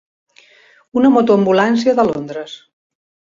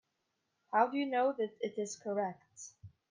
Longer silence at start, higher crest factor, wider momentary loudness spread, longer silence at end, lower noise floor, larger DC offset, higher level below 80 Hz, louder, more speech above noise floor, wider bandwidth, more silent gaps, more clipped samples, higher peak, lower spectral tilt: first, 0.95 s vs 0.7 s; about the same, 16 dB vs 20 dB; about the same, 17 LU vs 19 LU; first, 0.75 s vs 0.25 s; second, -49 dBFS vs -83 dBFS; neither; first, -58 dBFS vs -84 dBFS; first, -14 LUFS vs -35 LUFS; second, 36 dB vs 48 dB; second, 7.6 kHz vs 10 kHz; neither; neither; first, -2 dBFS vs -16 dBFS; first, -6.5 dB/octave vs -4.5 dB/octave